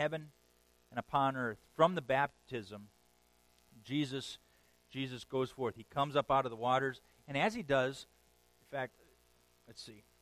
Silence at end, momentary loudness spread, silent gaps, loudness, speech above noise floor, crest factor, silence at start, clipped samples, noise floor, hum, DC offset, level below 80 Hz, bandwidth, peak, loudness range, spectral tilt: 0.2 s; 19 LU; none; -36 LUFS; 35 dB; 24 dB; 0 s; under 0.1%; -71 dBFS; 60 Hz at -70 dBFS; under 0.1%; -70 dBFS; 15.5 kHz; -14 dBFS; 7 LU; -5.5 dB/octave